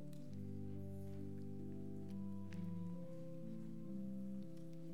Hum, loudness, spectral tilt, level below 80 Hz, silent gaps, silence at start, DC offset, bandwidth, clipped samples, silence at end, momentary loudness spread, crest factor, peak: none; -50 LUFS; -9 dB/octave; -84 dBFS; none; 0 s; 0.3%; 16.5 kHz; under 0.1%; 0 s; 4 LU; 10 dB; -36 dBFS